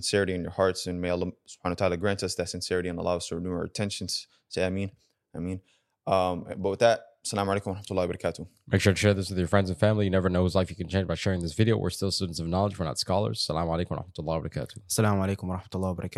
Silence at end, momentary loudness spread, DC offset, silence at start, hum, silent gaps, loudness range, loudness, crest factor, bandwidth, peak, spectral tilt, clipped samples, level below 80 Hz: 0 s; 10 LU; under 0.1%; 0 s; none; none; 5 LU; -28 LUFS; 22 dB; 13.5 kHz; -6 dBFS; -5.5 dB/octave; under 0.1%; -52 dBFS